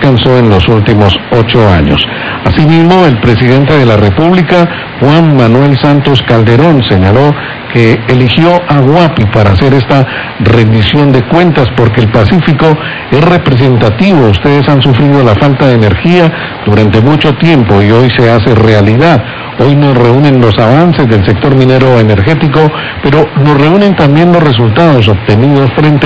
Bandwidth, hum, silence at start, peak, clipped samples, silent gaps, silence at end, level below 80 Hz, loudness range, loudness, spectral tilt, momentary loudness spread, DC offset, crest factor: 8 kHz; none; 0 s; 0 dBFS; 10%; none; 0 s; -24 dBFS; 1 LU; -6 LUFS; -8.5 dB/octave; 3 LU; 2%; 6 dB